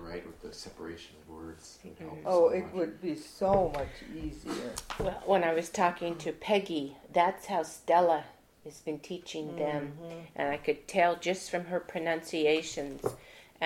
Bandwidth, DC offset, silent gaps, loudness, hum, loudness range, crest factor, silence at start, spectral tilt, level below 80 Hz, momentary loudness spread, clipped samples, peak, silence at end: 16.5 kHz; under 0.1%; none; -31 LUFS; none; 3 LU; 20 dB; 0 s; -4.5 dB/octave; -54 dBFS; 18 LU; under 0.1%; -12 dBFS; 0 s